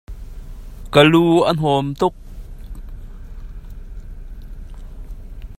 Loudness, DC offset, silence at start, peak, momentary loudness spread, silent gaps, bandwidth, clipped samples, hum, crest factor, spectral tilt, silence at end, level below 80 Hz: -15 LUFS; under 0.1%; 0.1 s; 0 dBFS; 26 LU; none; 14.5 kHz; under 0.1%; none; 20 dB; -6.5 dB/octave; 0.05 s; -34 dBFS